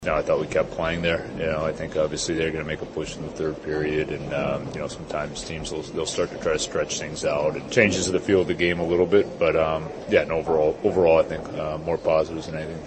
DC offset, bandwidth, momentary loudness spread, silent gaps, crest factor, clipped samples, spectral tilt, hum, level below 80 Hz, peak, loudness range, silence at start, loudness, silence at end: under 0.1%; 8.8 kHz; 10 LU; none; 20 dB; under 0.1%; -4.5 dB/octave; none; -46 dBFS; -4 dBFS; 6 LU; 0 s; -24 LUFS; 0 s